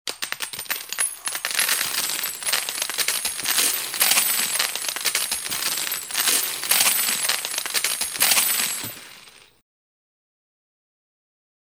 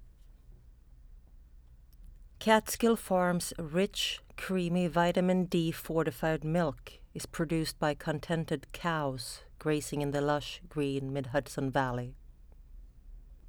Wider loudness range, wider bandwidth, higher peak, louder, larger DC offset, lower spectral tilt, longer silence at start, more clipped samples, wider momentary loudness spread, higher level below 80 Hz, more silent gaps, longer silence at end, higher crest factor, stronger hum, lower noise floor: about the same, 4 LU vs 4 LU; second, 18 kHz vs over 20 kHz; first, -2 dBFS vs -10 dBFS; first, -21 LUFS vs -32 LUFS; neither; second, 2 dB/octave vs -5 dB/octave; about the same, 0.05 s vs 0 s; neither; about the same, 10 LU vs 10 LU; second, -66 dBFS vs -52 dBFS; neither; first, 2.25 s vs 0 s; about the same, 22 dB vs 22 dB; neither; second, -48 dBFS vs -55 dBFS